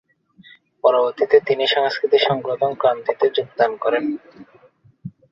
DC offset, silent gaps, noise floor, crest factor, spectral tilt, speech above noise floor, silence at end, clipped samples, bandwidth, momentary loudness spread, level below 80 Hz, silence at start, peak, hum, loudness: under 0.1%; none; -53 dBFS; 18 dB; -5.5 dB/octave; 34 dB; 0.2 s; under 0.1%; 7.2 kHz; 12 LU; -66 dBFS; 0.85 s; -2 dBFS; none; -19 LUFS